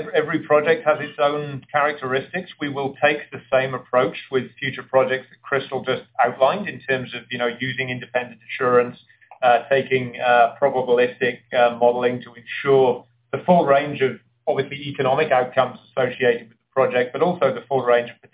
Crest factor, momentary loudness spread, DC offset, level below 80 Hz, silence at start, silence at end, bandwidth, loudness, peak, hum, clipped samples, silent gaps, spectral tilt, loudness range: 16 dB; 10 LU; under 0.1%; -64 dBFS; 0 s; 0.2 s; 4 kHz; -21 LUFS; -4 dBFS; none; under 0.1%; none; -9 dB/octave; 3 LU